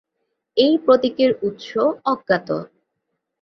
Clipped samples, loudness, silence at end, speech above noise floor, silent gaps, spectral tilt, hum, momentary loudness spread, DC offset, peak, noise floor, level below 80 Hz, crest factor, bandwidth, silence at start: under 0.1%; -19 LUFS; 0.75 s; 58 dB; none; -6.5 dB/octave; none; 9 LU; under 0.1%; -2 dBFS; -77 dBFS; -62 dBFS; 18 dB; 6.4 kHz; 0.55 s